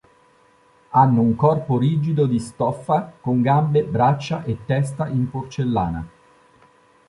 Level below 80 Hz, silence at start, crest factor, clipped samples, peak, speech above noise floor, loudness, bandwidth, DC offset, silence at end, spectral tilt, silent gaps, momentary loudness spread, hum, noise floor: -48 dBFS; 0.9 s; 18 dB; under 0.1%; -2 dBFS; 36 dB; -20 LUFS; 11.5 kHz; under 0.1%; 1 s; -8.5 dB/octave; none; 9 LU; none; -56 dBFS